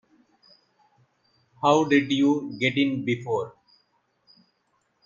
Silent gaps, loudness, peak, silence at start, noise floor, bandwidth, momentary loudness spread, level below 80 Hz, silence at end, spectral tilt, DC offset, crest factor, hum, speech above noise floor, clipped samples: none; -23 LUFS; -6 dBFS; 1.6 s; -71 dBFS; 7.4 kHz; 9 LU; -68 dBFS; 1.55 s; -5.5 dB/octave; under 0.1%; 22 dB; none; 48 dB; under 0.1%